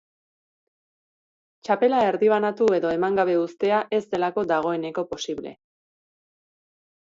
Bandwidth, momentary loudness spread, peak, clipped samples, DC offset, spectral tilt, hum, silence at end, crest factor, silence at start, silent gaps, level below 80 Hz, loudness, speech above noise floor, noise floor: 7.6 kHz; 10 LU; -8 dBFS; under 0.1%; under 0.1%; -5.5 dB/octave; none; 1.6 s; 16 dB; 1.65 s; none; -66 dBFS; -23 LUFS; over 68 dB; under -90 dBFS